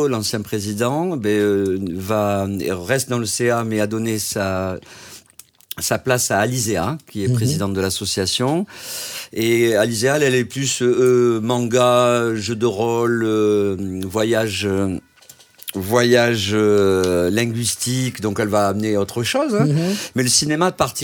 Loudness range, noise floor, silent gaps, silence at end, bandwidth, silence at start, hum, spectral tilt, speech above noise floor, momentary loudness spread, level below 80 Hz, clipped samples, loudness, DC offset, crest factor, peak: 4 LU; -48 dBFS; none; 0 s; 19.5 kHz; 0 s; none; -4.5 dB/octave; 29 dB; 9 LU; -54 dBFS; under 0.1%; -19 LUFS; under 0.1%; 18 dB; -2 dBFS